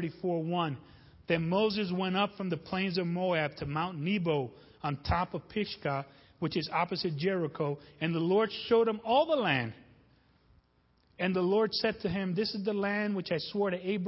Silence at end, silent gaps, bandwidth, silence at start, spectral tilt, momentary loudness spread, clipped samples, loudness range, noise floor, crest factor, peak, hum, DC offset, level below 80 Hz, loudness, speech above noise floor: 0 s; none; 5.8 kHz; 0 s; -9.5 dB/octave; 8 LU; under 0.1%; 4 LU; -69 dBFS; 18 dB; -12 dBFS; none; under 0.1%; -56 dBFS; -31 LUFS; 38 dB